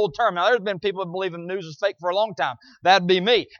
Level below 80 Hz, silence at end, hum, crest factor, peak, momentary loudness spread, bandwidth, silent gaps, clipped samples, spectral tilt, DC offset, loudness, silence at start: -64 dBFS; 0.15 s; none; 18 dB; -4 dBFS; 10 LU; 7 kHz; none; under 0.1%; -5 dB/octave; under 0.1%; -22 LUFS; 0 s